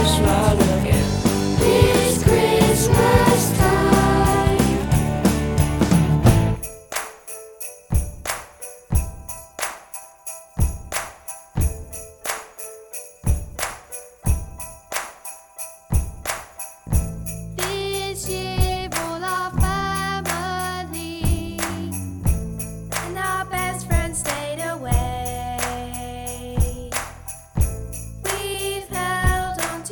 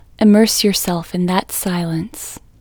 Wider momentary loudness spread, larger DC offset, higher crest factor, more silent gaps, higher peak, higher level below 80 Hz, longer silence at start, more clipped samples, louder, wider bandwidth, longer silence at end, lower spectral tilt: about the same, 17 LU vs 15 LU; neither; about the same, 20 dB vs 16 dB; neither; about the same, 0 dBFS vs 0 dBFS; first, -28 dBFS vs -46 dBFS; second, 0 s vs 0.2 s; neither; second, -22 LUFS vs -16 LUFS; about the same, over 20 kHz vs over 20 kHz; second, 0 s vs 0.25 s; about the same, -5 dB/octave vs -4.5 dB/octave